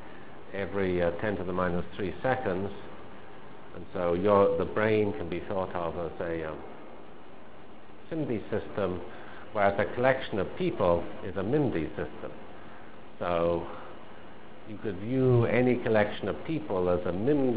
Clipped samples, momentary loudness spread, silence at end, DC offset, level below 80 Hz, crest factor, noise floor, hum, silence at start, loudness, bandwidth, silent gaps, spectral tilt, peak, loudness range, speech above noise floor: under 0.1%; 23 LU; 0 s; 1%; -52 dBFS; 22 dB; -50 dBFS; none; 0 s; -29 LUFS; 4 kHz; none; -11 dB/octave; -8 dBFS; 7 LU; 22 dB